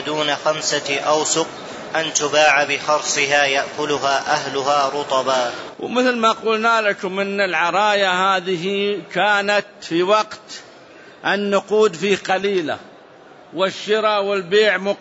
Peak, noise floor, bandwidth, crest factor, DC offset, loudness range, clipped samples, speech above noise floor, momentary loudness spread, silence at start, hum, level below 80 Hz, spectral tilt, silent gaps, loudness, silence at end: -2 dBFS; -44 dBFS; 8 kHz; 16 dB; under 0.1%; 3 LU; under 0.1%; 25 dB; 8 LU; 0 s; none; -66 dBFS; -2.5 dB/octave; none; -18 LUFS; 0 s